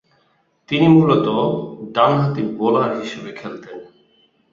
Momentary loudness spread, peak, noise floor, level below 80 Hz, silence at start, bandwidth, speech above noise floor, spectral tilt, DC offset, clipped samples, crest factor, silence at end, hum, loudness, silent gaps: 20 LU; -2 dBFS; -62 dBFS; -58 dBFS; 0.7 s; 7.4 kHz; 45 dB; -8 dB/octave; under 0.1%; under 0.1%; 18 dB; 0.7 s; none; -17 LUFS; none